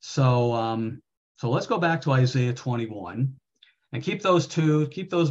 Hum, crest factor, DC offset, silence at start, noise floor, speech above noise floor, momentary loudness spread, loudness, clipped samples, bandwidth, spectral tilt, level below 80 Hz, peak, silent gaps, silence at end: none; 16 dB; under 0.1%; 0.05 s; -60 dBFS; 36 dB; 11 LU; -25 LUFS; under 0.1%; 7.8 kHz; -6.5 dB/octave; -64 dBFS; -8 dBFS; 1.17-1.35 s; 0 s